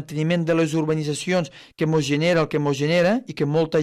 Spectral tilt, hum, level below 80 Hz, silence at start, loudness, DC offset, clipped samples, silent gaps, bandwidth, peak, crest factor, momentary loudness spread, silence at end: -6 dB/octave; none; -58 dBFS; 0 s; -21 LUFS; under 0.1%; under 0.1%; none; 13.5 kHz; -8 dBFS; 14 dB; 5 LU; 0 s